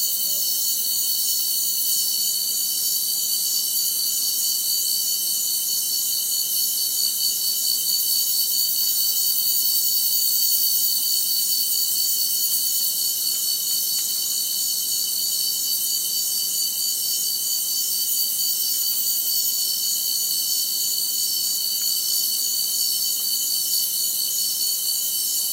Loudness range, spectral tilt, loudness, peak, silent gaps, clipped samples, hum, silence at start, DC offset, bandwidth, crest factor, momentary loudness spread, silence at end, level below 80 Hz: 3 LU; 3 dB/octave; -19 LUFS; -6 dBFS; none; under 0.1%; none; 0 s; under 0.1%; 16 kHz; 16 dB; 3 LU; 0 s; -82 dBFS